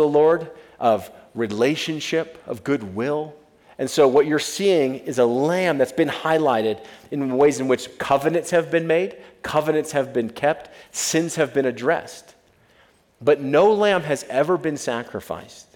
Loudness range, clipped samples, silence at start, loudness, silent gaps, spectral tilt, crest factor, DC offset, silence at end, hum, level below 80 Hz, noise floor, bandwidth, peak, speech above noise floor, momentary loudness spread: 4 LU; under 0.1%; 0 s; -21 LUFS; none; -4.5 dB/octave; 18 dB; under 0.1%; 0.15 s; none; -62 dBFS; -57 dBFS; 17.5 kHz; -4 dBFS; 36 dB; 13 LU